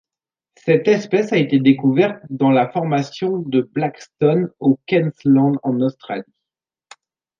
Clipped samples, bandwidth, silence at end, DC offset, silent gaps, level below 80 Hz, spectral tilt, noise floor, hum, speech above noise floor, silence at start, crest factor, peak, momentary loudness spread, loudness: under 0.1%; 7.4 kHz; 1.15 s; under 0.1%; none; -66 dBFS; -7.5 dB/octave; -88 dBFS; none; 71 dB; 0.65 s; 16 dB; -2 dBFS; 8 LU; -18 LUFS